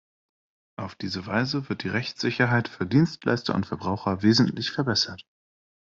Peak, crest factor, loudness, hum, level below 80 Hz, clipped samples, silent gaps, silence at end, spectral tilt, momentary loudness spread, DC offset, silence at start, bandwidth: -8 dBFS; 18 dB; -25 LUFS; none; -62 dBFS; under 0.1%; none; 0.75 s; -5.5 dB/octave; 12 LU; under 0.1%; 0.8 s; 7.6 kHz